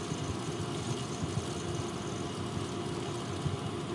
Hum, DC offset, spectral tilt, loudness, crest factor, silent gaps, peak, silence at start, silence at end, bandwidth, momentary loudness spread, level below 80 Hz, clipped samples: none; under 0.1%; -5 dB/octave; -36 LUFS; 16 dB; none; -20 dBFS; 0 s; 0 s; 11.5 kHz; 1 LU; -58 dBFS; under 0.1%